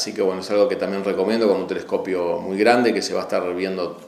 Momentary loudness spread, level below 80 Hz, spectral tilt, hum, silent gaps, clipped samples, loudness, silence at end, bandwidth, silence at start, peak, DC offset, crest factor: 7 LU; -66 dBFS; -4.5 dB/octave; none; none; under 0.1%; -21 LUFS; 0 s; 13.5 kHz; 0 s; -2 dBFS; under 0.1%; 20 dB